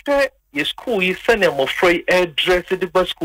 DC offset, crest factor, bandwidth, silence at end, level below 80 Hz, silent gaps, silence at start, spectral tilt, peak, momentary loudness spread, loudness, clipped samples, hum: under 0.1%; 14 dB; 16 kHz; 0 s; -44 dBFS; none; 0.05 s; -4 dB/octave; -4 dBFS; 6 LU; -18 LUFS; under 0.1%; none